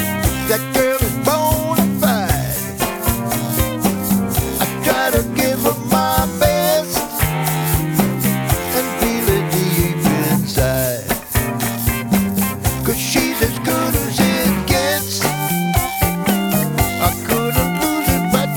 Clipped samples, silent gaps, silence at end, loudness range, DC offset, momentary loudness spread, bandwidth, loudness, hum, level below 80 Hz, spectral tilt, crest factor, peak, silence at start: under 0.1%; none; 0 s; 1 LU; under 0.1%; 3 LU; over 20 kHz; -17 LUFS; none; -30 dBFS; -4.5 dB/octave; 16 dB; 0 dBFS; 0 s